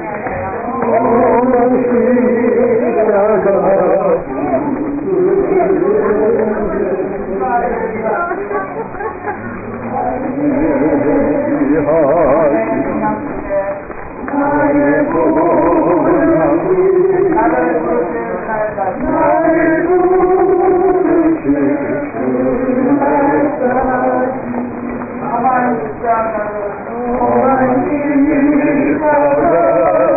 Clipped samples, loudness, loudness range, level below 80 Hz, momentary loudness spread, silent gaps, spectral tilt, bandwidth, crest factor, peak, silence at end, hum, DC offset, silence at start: under 0.1%; -13 LUFS; 5 LU; -38 dBFS; 9 LU; none; -16.5 dB/octave; 2.7 kHz; 8 dB; -4 dBFS; 0 s; none; under 0.1%; 0 s